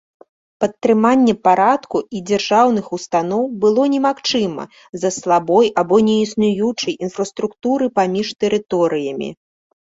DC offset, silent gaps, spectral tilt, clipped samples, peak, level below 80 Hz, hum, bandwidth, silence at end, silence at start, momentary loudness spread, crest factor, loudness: under 0.1%; 4.89-4.93 s; -5 dB/octave; under 0.1%; -2 dBFS; -58 dBFS; none; 8 kHz; 0.55 s; 0.6 s; 9 LU; 16 dB; -17 LUFS